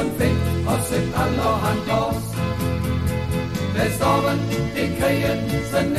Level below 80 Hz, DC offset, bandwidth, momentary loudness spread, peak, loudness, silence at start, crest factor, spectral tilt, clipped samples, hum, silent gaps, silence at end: -34 dBFS; under 0.1%; 15.5 kHz; 4 LU; -8 dBFS; -22 LUFS; 0 s; 14 dB; -6 dB/octave; under 0.1%; none; none; 0 s